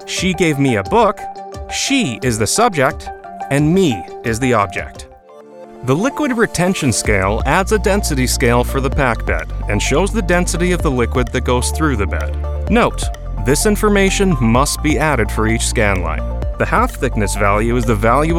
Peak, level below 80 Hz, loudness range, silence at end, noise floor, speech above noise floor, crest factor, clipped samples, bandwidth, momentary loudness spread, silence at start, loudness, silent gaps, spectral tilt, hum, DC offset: 0 dBFS; -24 dBFS; 2 LU; 0 s; -39 dBFS; 25 dB; 16 dB; under 0.1%; 16.5 kHz; 8 LU; 0 s; -16 LUFS; none; -5 dB/octave; none; under 0.1%